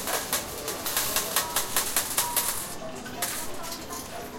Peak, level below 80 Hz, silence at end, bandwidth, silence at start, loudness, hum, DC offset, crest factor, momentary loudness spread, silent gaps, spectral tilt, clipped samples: -6 dBFS; -52 dBFS; 0 s; 17 kHz; 0 s; -28 LUFS; none; under 0.1%; 24 dB; 11 LU; none; -1 dB/octave; under 0.1%